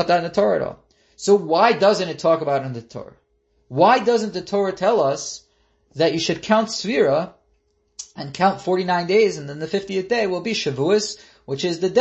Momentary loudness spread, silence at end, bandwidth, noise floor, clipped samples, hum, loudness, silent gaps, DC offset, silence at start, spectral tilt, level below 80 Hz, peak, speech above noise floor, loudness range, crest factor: 16 LU; 0 s; 8.4 kHz; -65 dBFS; under 0.1%; none; -20 LUFS; none; under 0.1%; 0 s; -4.5 dB/octave; -60 dBFS; -2 dBFS; 45 dB; 3 LU; 18 dB